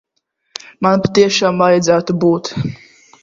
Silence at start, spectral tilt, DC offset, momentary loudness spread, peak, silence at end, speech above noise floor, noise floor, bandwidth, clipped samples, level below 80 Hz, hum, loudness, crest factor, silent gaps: 0.8 s; -5 dB/octave; under 0.1%; 17 LU; 0 dBFS; 0.45 s; 55 dB; -68 dBFS; 7.6 kHz; under 0.1%; -50 dBFS; none; -14 LUFS; 16 dB; none